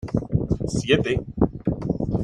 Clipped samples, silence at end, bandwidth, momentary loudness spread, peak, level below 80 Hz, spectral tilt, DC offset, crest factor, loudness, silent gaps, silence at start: under 0.1%; 0 s; 11 kHz; 5 LU; -4 dBFS; -38 dBFS; -6.5 dB/octave; under 0.1%; 20 dB; -24 LUFS; none; 0 s